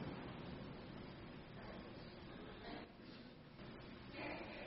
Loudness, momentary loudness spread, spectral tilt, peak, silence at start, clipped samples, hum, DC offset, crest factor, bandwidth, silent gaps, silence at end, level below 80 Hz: -54 LUFS; 8 LU; -4.5 dB/octave; -36 dBFS; 0 s; under 0.1%; none; under 0.1%; 18 dB; 5.6 kHz; none; 0 s; -66 dBFS